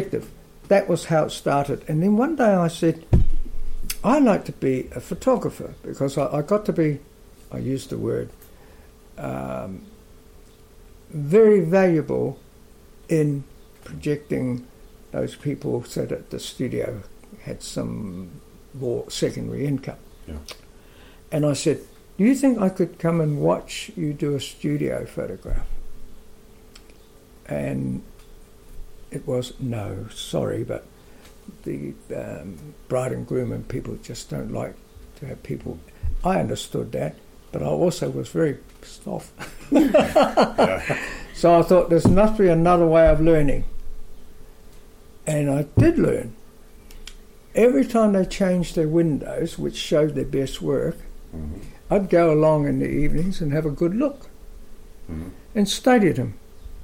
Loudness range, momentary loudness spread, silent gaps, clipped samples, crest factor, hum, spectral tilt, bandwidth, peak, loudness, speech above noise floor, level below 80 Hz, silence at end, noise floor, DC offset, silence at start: 12 LU; 19 LU; none; under 0.1%; 18 dB; none; -6.5 dB/octave; 16.5 kHz; -6 dBFS; -22 LUFS; 27 dB; -34 dBFS; 0 s; -48 dBFS; under 0.1%; 0 s